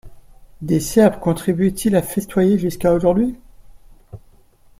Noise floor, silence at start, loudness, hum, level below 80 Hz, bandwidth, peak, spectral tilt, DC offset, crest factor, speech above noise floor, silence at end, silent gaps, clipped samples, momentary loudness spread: -50 dBFS; 0.05 s; -18 LUFS; none; -42 dBFS; 16.5 kHz; -2 dBFS; -6.5 dB/octave; under 0.1%; 18 dB; 33 dB; 0.6 s; none; under 0.1%; 7 LU